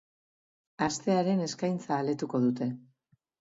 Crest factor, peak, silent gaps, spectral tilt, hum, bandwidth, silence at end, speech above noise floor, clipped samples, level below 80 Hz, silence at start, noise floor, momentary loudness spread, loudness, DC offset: 16 dB; -14 dBFS; none; -6 dB/octave; none; 7.8 kHz; 0.7 s; 42 dB; under 0.1%; -70 dBFS; 0.8 s; -71 dBFS; 7 LU; -30 LUFS; under 0.1%